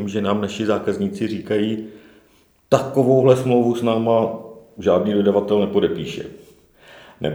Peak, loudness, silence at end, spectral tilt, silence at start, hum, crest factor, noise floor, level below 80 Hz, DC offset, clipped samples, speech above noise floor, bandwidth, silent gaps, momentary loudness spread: 0 dBFS; -19 LUFS; 0 s; -7 dB/octave; 0 s; none; 20 dB; -56 dBFS; -56 dBFS; under 0.1%; under 0.1%; 38 dB; over 20 kHz; none; 14 LU